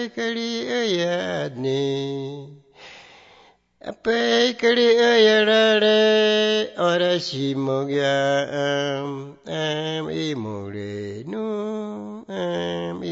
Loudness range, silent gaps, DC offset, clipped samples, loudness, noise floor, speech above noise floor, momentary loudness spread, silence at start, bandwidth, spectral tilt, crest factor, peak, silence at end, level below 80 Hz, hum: 11 LU; none; under 0.1%; under 0.1%; -21 LUFS; -54 dBFS; 33 dB; 16 LU; 0 s; 8 kHz; -4.5 dB/octave; 16 dB; -6 dBFS; 0 s; -66 dBFS; none